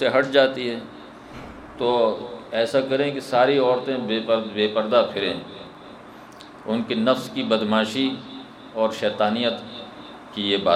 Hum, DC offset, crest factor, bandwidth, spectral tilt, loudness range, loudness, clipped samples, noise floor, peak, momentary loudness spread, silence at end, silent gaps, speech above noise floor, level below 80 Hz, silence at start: none; under 0.1%; 20 dB; 13.5 kHz; -5 dB/octave; 3 LU; -22 LUFS; under 0.1%; -43 dBFS; -2 dBFS; 21 LU; 0 s; none; 21 dB; -60 dBFS; 0 s